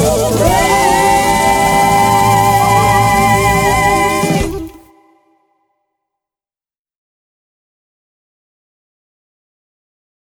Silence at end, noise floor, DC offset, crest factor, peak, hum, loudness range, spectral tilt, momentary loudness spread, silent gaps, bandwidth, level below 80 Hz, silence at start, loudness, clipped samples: 5.5 s; under -90 dBFS; under 0.1%; 14 dB; 0 dBFS; none; 10 LU; -4 dB/octave; 5 LU; none; 20 kHz; -30 dBFS; 0 s; -11 LUFS; under 0.1%